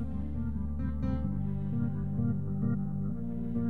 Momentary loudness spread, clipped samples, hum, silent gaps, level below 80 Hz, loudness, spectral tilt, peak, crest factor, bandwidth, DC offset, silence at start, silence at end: 4 LU; under 0.1%; none; none; -40 dBFS; -34 LUFS; -11.5 dB/octave; -20 dBFS; 12 dB; 4.3 kHz; 1%; 0 s; 0 s